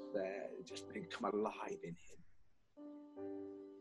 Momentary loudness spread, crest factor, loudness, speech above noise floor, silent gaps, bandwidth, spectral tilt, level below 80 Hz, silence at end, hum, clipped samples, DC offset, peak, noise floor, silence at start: 16 LU; 22 dB; -46 LUFS; 24 dB; none; 11.5 kHz; -5 dB/octave; -80 dBFS; 0 s; none; under 0.1%; under 0.1%; -26 dBFS; -69 dBFS; 0 s